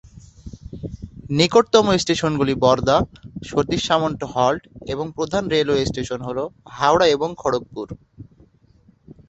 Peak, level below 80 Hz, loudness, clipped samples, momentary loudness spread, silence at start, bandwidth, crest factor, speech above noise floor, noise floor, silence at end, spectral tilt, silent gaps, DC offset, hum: -2 dBFS; -44 dBFS; -20 LUFS; under 0.1%; 18 LU; 0.15 s; 8.2 kHz; 20 dB; 35 dB; -55 dBFS; 1.05 s; -5 dB/octave; none; under 0.1%; none